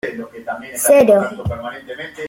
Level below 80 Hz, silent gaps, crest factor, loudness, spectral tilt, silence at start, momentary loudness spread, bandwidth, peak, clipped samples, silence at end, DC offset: -46 dBFS; none; 16 dB; -14 LUFS; -4.5 dB/octave; 0.05 s; 19 LU; 16.5 kHz; -2 dBFS; under 0.1%; 0 s; under 0.1%